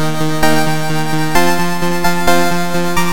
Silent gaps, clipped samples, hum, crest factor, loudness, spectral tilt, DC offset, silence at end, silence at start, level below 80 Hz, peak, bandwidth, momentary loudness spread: none; under 0.1%; none; 16 dB; -15 LUFS; -4.5 dB/octave; 20%; 0 s; 0 s; -34 dBFS; 0 dBFS; 17 kHz; 4 LU